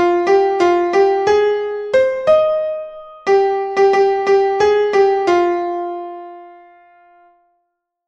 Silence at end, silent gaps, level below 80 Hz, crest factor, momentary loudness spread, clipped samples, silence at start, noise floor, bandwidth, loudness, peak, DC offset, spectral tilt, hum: 1.55 s; none; -54 dBFS; 14 dB; 12 LU; under 0.1%; 0 s; -71 dBFS; 7.6 kHz; -15 LUFS; -2 dBFS; under 0.1%; -4.5 dB/octave; none